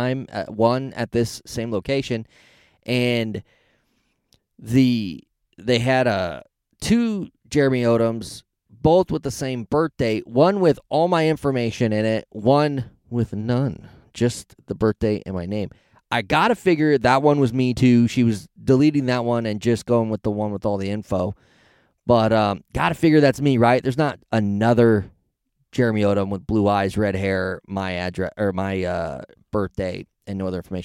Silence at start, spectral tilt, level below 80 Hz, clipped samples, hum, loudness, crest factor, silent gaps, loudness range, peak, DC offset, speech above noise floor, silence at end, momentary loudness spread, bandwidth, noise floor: 0 s; -6.5 dB/octave; -48 dBFS; under 0.1%; none; -21 LUFS; 18 dB; none; 6 LU; -4 dBFS; under 0.1%; 50 dB; 0 s; 12 LU; 15.5 kHz; -70 dBFS